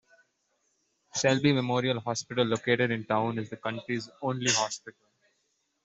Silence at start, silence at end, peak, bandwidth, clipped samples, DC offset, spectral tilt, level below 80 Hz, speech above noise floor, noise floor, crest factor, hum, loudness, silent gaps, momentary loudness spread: 1.15 s; 0.95 s; -10 dBFS; 8.2 kHz; under 0.1%; under 0.1%; -4 dB/octave; -70 dBFS; 47 dB; -76 dBFS; 20 dB; none; -28 LUFS; none; 10 LU